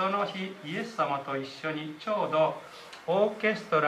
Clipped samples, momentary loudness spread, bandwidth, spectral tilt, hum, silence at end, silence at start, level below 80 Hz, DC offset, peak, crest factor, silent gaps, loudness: under 0.1%; 10 LU; 13.5 kHz; -5.5 dB/octave; none; 0 s; 0 s; -78 dBFS; under 0.1%; -12 dBFS; 18 dB; none; -30 LUFS